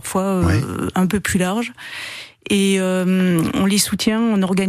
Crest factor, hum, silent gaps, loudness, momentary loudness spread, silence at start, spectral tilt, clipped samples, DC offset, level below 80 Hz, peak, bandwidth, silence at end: 16 dB; none; none; -18 LUFS; 12 LU; 0.05 s; -5 dB/octave; under 0.1%; under 0.1%; -42 dBFS; -4 dBFS; 15 kHz; 0 s